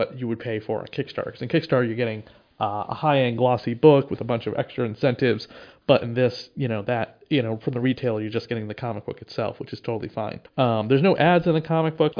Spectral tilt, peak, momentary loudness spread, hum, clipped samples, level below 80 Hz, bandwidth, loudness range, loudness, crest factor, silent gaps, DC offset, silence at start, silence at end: -8.5 dB/octave; -2 dBFS; 12 LU; none; under 0.1%; -60 dBFS; 5.2 kHz; 5 LU; -24 LUFS; 20 dB; none; under 0.1%; 0 s; 0 s